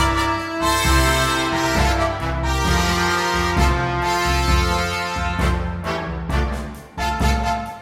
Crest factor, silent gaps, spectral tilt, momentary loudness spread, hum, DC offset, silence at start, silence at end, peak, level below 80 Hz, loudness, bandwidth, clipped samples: 16 dB; none; -4.5 dB/octave; 8 LU; none; under 0.1%; 0 s; 0 s; -4 dBFS; -24 dBFS; -20 LUFS; 16.5 kHz; under 0.1%